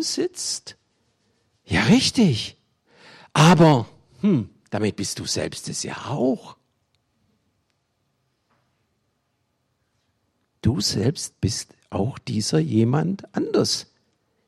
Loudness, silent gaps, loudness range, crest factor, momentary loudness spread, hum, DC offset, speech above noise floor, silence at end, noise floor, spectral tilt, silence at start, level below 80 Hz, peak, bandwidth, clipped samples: -22 LUFS; none; 12 LU; 18 dB; 12 LU; none; under 0.1%; 51 dB; 0.65 s; -72 dBFS; -5 dB/octave; 0 s; -54 dBFS; -6 dBFS; 13.5 kHz; under 0.1%